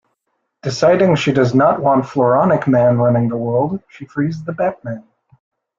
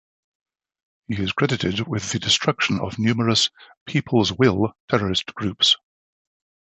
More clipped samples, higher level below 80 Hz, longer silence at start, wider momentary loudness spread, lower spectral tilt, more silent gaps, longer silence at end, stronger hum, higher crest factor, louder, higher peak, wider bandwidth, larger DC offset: neither; second, -54 dBFS vs -48 dBFS; second, 0.65 s vs 1.1 s; first, 15 LU vs 8 LU; first, -7 dB/octave vs -4 dB/octave; second, none vs 3.77-3.86 s, 4.80-4.88 s; about the same, 0.8 s vs 0.85 s; neither; second, 14 dB vs 22 dB; first, -15 LUFS vs -21 LUFS; about the same, -2 dBFS vs -2 dBFS; second, 7.6 kHz vs 8.4 kHz; neither